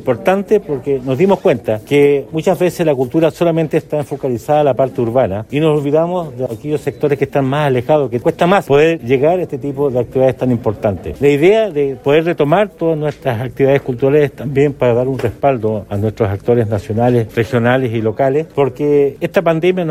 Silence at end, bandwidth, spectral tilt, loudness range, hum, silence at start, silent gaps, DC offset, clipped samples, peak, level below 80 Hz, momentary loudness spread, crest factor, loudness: 0 s; 15.5 kHz; -7.5 dB/octave; 2 LU; none; 0 s; none; under 0.1%; under 0.1%; 0 dBFS; -46 dBFS; 6 LU; 14 dB; -15 LUFS